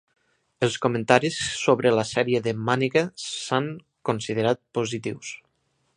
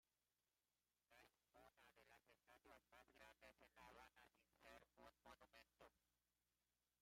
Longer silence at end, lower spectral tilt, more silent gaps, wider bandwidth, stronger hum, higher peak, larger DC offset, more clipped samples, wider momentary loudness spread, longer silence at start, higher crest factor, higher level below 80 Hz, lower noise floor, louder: first, 0.6 s vs 0.05 s; first, -4.5 dB/octave vs -3 dB/octave; neither; second, 10.5 kHz vs 16 kHz; second, none vs 60 Hz at -90 dBFS; first, 0 dBFS vs -52 dBFS; neither; neither; first, 12 LU vs 2 LU; first, 0.6 s vs 0.05 s; about the same, 24 dB vs 20 dB; first, -62 dBFS vs -88 dBFS; second, -71 dBFS vs under -90 dBFS; first, -24 LUFS vs -69 LUFS